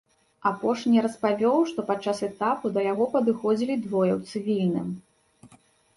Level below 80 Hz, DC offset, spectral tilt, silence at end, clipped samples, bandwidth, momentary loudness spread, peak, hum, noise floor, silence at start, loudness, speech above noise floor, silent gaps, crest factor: -68 dBFS; under 0.1%; -7 dB/octave; 0.5 s; under 0.1%; 11.5 kHz; 7 LU; -10 dBFS; none; -58 dBFS; 0.45 s; -25 LUFS; 33 dB; none; 16 dB